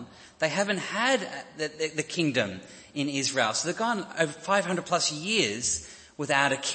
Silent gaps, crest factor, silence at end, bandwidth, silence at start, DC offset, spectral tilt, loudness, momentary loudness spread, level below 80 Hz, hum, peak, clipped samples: none; 22 dB; 0 s; 8.8 kHz; 0 s; under 0.1%; -2.5 dB/octave; -27 LUFS; 10 LU; -64 dBFS; none; -8 dBFS; under 0.1%